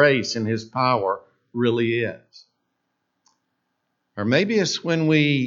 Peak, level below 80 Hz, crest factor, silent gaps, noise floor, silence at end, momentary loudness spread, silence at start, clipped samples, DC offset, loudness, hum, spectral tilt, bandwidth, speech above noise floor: -2 dBFS; -70 dBFS; 20 dB; none; -75 dBFS; 0 s; 12 LU; 0 s; under 0.1%; under 0.1%; -22 LUFS; none; -5.5 dB/octave; 7.8 kHz; 54 dB